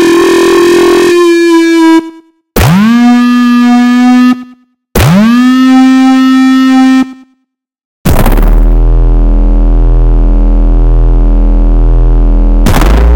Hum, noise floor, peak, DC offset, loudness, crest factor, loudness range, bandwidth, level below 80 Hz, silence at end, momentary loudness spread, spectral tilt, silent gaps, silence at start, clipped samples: none; -63 dBFS; 0 dBFS; under 0.1%; -7 LUFS; 4 dB; 4 LU; 17 kHz; -8 dBFS; 0 s; 5 LU; -6.5 dB/octave; 7.85-8.04 s; 0 s; under 0.1%